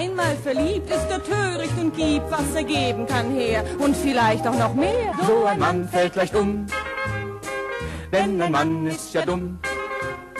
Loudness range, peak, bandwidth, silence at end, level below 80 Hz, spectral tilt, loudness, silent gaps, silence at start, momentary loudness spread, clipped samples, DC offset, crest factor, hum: 4 LU; -8 dBFS; 13 kHz; 0 s; -40 dBFS; -5.5 dB/octave; -23 LUFS; none; 0 s; 8 LU; under 0.1%; under 0.1%; 14 dB; none